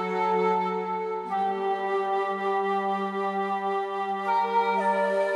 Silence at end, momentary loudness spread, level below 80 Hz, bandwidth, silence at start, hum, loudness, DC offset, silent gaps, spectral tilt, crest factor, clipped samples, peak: 0 s; 5 LU; -76 dBFS; 11.5 kHz; 0 s; none; -27 LUFS; under 0.1%; none; -6 dB/octave; 12 dB; under 0.1%; -14 dBFS